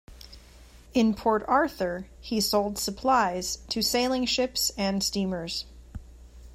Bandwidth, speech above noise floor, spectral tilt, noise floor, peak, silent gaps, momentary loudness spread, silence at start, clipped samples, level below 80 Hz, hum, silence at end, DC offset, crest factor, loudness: 16 kHz; 24 dB; -3.5 dB/octave; -51 dBFS; -10 dBFS; none; 10 LU; 0.1 s; under 0.1%; -48 dBFS; none; 0 s; under 0.1%; 18 dB; -26 LUFS